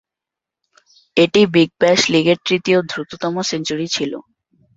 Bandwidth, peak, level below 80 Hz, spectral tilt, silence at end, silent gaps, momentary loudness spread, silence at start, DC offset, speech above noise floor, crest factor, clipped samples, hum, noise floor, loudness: 8 kHz; 0 dBFS; -58 dBFS; -4.5 dB/octave; 0.55 s; none; 10 LU; 1.15 s; under 0.1%; 69 dB; 18 dB; under 0.1%; none; -86 dBFS; -16 LUFS